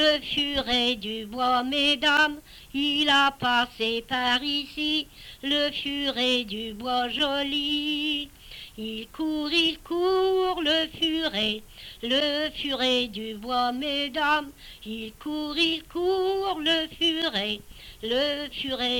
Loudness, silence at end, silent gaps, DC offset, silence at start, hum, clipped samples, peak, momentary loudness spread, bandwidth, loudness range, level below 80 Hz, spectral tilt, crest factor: -25 LUFS; 0 s; none; under 0.1%; 0 s; none; under 0.1%; -10 dBFS; 13 LU; 19 kHz; 4 LU; -52 dBFS; -3 dB/octave; 18 dB